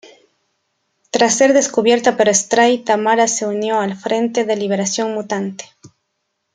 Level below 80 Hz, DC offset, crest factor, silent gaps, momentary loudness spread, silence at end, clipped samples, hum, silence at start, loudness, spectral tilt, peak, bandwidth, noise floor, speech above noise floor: -64 dBFS; under 0.1%; 16 dB; none; 9 LU; 0.65 s; under 0.1%; none; 1.15 s; -16 LUFS; -3 dB/octave; 0 dBFS; 10 kHz; -72 dBFS; 57 dB